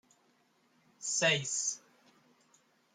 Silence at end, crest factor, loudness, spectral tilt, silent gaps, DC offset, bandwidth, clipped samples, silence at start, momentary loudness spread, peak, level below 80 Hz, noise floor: 1.15 s; 22 dB; -31 LUFS; -1.5 dB/octave; none; under 0.1%; 14 kHz; under 0.1%; 1 s; 13 LU; -16 dBFS; -82 dBFS; -71 dBFS